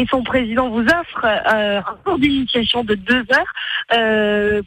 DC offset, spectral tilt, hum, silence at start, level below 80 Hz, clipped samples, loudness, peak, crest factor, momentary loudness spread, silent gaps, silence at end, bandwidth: under 0.1%; -5 dB/octave; none; 0 s; -42 dBFS; under 0.1%; -17 LUFS; -4 dBFS; 14 dB; 5 LU; none; 0 s; 16 kHz